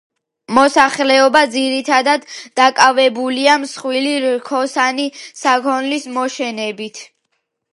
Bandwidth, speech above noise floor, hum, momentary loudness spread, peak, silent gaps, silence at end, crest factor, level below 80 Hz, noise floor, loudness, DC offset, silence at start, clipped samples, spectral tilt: 11.5 kHz; 55 dB; none; 12 LU; 0 dBFS; none; 0.7 s; 16 dB; -62 dBFS; -70 dBFS; -15 LUFS; under 0.1%; 0.5 s; under 0.1%; -2 dB/octave